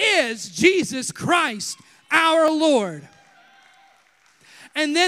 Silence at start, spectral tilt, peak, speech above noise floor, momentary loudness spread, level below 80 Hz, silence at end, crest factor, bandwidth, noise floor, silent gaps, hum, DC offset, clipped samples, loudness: 0 s; -3 dB/octave; -2 dBFS; 38 dB; 13 LU; -66 dBFS; 0 s; 20 dB; 15.5 kHz; -58 dBFS; none; none; under 0.1%; under 0.1%; -20 LUFS